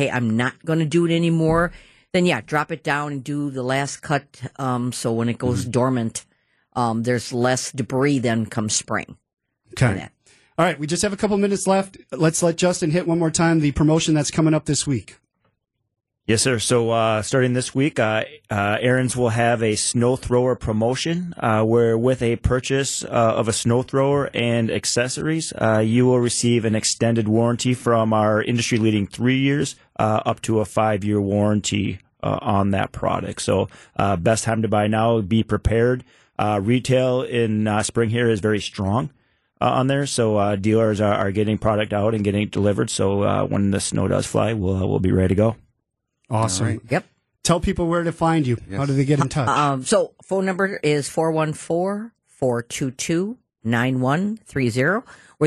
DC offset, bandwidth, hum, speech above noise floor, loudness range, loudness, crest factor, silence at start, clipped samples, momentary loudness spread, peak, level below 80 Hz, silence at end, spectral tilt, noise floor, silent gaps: under 0.1%; 12.5 kHz; none; 56 dB; 4 LU; -21 LUFS; 14 dB; 0 s; under 0.1%; 6 LU; -6 dBFS; -44 dBFS; 0 s; -5 dB/octave; -76 dBFS; none